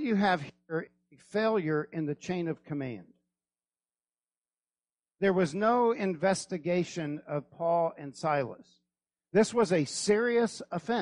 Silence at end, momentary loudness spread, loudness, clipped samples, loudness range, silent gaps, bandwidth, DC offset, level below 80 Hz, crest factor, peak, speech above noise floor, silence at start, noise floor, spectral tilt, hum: 0 s; 11 LU; -30 LUFS; under 0.1%; 7 LU; none; 11 kHz; under 0.1%; -72 dBFS; 18 dB; -12 dBFS; over 61 dB; 0 s; under -90 dBFS; -5.5 dB/octave; none